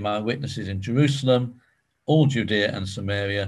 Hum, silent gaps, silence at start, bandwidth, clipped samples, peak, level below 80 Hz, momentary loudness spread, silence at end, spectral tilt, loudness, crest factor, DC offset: none; none; 0 s; 11.5 kHz; under 0.1%; -6 dBFS; -48 dBFS; 10 LU; 0 s; -6.5 dB/octave; -23 LUFS; 18 dB; under 0.1%